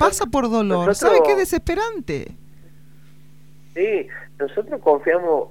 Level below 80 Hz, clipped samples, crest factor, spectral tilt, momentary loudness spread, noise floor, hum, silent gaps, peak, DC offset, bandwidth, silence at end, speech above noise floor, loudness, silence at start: -42 dBFS; under 0.1%; 18 dB; -4.5 dB/octave; 14 LU; -49 dBFS; none; none; -2 dBFS; 0.8%; 17 kHz; 0.05 s; 30 dB; -20 LUFS; 0 s